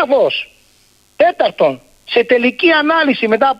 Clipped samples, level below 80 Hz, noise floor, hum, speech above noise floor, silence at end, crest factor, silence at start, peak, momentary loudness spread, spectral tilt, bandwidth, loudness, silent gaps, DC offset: under 0.1%; -58 dBFS; -52 dBFS; none; 39 dB; 0.05 s; 14 dB; 0 s; 0 dBFS; 7 LU; -5.5 dB/octave; 11.5 kHz; -13 LUFS; none; under 0.1%